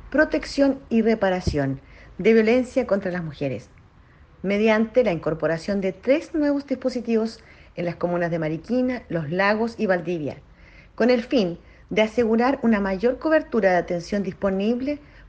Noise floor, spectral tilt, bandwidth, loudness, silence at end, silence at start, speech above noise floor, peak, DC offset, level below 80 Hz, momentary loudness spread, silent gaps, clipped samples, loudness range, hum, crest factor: -51 dBFS; -6.5 dB/octave; 8.8 kHz; -23 LUFS; 0.1 s; 0.05 s; 29 dB; -6 dBFS; under 0.1%; -48 dBFS; 10 LU; none; under 0.1%; 3 LU; none; 16 dB